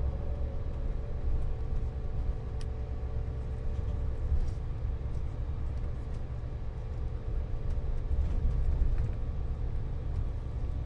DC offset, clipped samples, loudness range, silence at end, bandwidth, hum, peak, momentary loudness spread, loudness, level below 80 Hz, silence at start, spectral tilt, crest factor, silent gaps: under 0.1%; under 0.1%; 3 LU; 0 s; 6 kHz; none; -14 dBFS; 6 LU; -36 LUFS; -32 dBFS; 0 s; -9 dB/octave; 16 dB; none